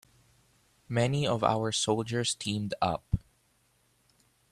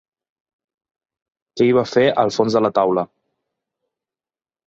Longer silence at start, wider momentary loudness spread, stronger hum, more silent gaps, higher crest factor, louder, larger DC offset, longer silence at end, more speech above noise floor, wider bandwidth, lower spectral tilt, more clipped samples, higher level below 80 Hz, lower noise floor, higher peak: second, 0.9 s vs 1.55 s; second, 6 LU vs 9 LU; neither; neither; about the same, 22 dB vs 18 dB; second, -30 LUFS vs -17 LUFS; neither; second, 1.35 s vs 1.65 s; second, 40 dB vs over 74 dB; first, 13.5 kHz vs 7.8 kHz; second, -4.5 dB/octave vs -6 dB/octave; neither; first, -52 dBFS vs -62 dBFS; second, -69 dBFS vs under -90 dBFS; second, -10 dBFS vs -2 dBFS